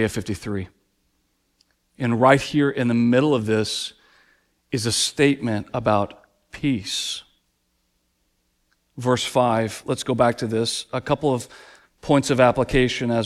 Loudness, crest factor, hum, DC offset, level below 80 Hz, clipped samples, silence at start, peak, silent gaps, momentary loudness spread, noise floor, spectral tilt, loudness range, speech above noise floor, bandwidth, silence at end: -21 LUFS; 22 dB; none; under 0.1%; -46 dBFS; under 0.1%; 0 s; -2 dBFS; none; 12 LU; -70 dBFS; -5 dB/octave; 6 LU; 49 dB; 14.5 kHz; 0 s